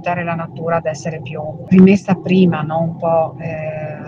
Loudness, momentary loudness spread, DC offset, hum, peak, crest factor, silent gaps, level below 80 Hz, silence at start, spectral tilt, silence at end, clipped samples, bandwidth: -16 LUFS; 15 LU; under 0.1%; none; 0 dBFS; 16 dB; none; -52 dBFS; 0 s; -8 dB/octave; 0 s; under 0.1%; 7.6 kHz